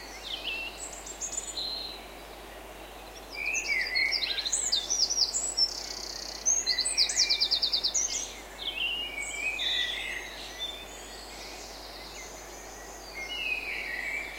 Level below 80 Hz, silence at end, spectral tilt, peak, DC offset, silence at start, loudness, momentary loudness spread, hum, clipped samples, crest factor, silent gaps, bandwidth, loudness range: -54 dBFS; 0 s; 1 dB/octave; -12 dBFS; under 0.1%; 0 s; -28 LUFS; 18 LU; none; under 0.1%; 22 dB; none; 16.5 kHz; 11 LU